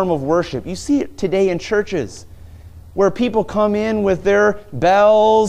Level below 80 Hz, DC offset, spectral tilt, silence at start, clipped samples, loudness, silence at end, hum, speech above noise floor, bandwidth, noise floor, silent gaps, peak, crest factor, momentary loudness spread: -42 dBFS; under 0.1%; -6 dB/octave; 0 s; under 0.1%; -17 LUFS; 0 s; none; 22 dB; 11 kHz; -38 dBFS; none; -2 dBFS; 14 dB; 12 LU